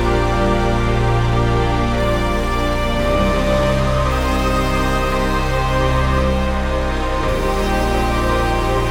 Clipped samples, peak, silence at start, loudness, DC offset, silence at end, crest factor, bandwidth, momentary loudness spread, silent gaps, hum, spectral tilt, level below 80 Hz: under 0.1%; -4 dBFS; 0 s; -18 LUFS; 0.4%; 0 s; 12 dB; 17 kHz; 2 LU; none; none; -6 dB/octave; -20 dBFS